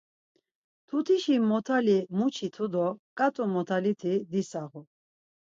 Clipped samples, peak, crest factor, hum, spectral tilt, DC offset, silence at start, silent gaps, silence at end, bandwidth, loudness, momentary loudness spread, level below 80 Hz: under 0.1%; -14 dBFS; 16 dB; none; -6.5 dB/octave; under 0.1%; 0.9 s; 2.99-3.16 s; 0.65 s; 7.8 kHz; -28 LUFS; 8 LU; -78 dBFS